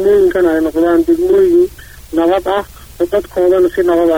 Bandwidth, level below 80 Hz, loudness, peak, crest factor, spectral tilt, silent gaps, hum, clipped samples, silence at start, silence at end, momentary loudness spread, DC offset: 16.5 kHz; -38 dBFS; -13 LUFS; -2 dBFS; 8 dB; -6 dB/octave; none; none; under 0.1%; 0 s; 0 s; 8 LU; 0.3%